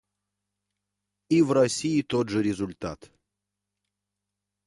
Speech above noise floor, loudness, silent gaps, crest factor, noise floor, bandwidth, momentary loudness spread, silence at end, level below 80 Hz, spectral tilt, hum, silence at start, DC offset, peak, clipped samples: 61 dB; -25 LUFS; none; 18 dB; -86 dBFS; 11.5 kHz; 15 LU; 1.7 s; -60 dBFS; -5.5 dB/octave; 50 Hz at -55 dBFS; 1.3 s; under 0.1%; -10 dBFS; under 0.1%